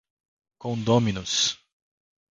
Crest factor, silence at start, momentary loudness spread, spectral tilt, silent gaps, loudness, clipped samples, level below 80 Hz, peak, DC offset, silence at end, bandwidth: 20 dB; 0.65 s; 14 LU; -4 dB/octave; none; -24 LUFS; under 0.1%; -56 dBFS; -6 dBFS; under 0.1%; 0.8 s; 9.6 kHz